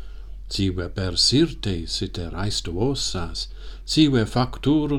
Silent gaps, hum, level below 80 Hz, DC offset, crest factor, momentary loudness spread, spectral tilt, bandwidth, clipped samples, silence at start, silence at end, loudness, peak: none; none; -36 dBFS; under 0.1%; 16 dB; 13 LU; -5 dB/octave; 14 kHz; under 0.1%; 0 s; 0 s; -23 LUFS; -6 dBFS